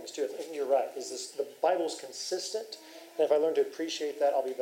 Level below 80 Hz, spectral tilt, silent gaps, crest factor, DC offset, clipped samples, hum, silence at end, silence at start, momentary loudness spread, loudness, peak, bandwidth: under -90 dBFS; -2 dB/octave; none; 18 dB; under 0.1%; under 0.1%; none; 0 s; 0 s; 11 LU; -31 LUFS; -14 dBFS; 16 kHz